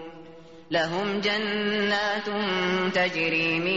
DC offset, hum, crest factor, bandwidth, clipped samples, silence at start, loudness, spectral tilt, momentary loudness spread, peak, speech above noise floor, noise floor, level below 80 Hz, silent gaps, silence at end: 0.2%; none; 14 dB; 8 kHz; under 0.1%; 0 s; -25 LUFS; -2 dB/octave; 4 LU; -12 dBFS; 21 dB; -47 dBFS; -64 dBFS; none; 0 s